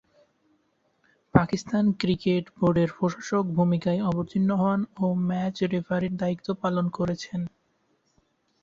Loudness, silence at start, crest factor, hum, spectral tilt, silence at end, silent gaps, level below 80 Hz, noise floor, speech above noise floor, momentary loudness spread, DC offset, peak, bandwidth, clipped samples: -26 LUFS; 1.35 s; 24 dB; none; -7.5 dB/octave; 1.15 s; none; -54 dBFS; -70 dBFS; 45 dB; 6 LU; under 0.1%; -4 dBFS; 7.6 kHz; under 0.1%